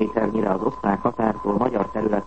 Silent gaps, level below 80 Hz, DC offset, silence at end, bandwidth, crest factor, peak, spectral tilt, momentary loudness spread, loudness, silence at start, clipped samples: none; -48 dBFS; 0.6%; 0 s; 8.2 kHz; 18 dB; -4 dBFS; -9 dB/octave; 1 LU; -23 LUFS; 0 s; under 0.1%